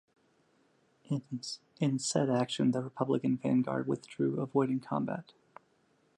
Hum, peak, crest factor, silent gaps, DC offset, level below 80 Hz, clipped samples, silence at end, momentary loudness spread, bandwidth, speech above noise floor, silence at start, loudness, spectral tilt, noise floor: none; -16 dBFS; 18 dB; none; under 0.1%; -76 dBFS; under 0.1%; 0.95 s; 8 LU; 11.5 kHz; 39 dB; 1.1 s; -33 LUFS; -6 dB/octave; -71 dBFS